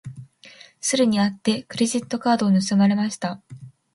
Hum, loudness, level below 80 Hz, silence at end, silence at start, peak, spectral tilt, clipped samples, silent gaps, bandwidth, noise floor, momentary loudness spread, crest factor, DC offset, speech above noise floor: none; -21 LUFS; -64 dBFS; 0.25 s; 0.05 s; -6 dBFS; -5 dB/octave; under 0.1%; none; 11.5 kHz; -48 dBFS; 11 LU; 16 dB; under 0.1%; 28 dB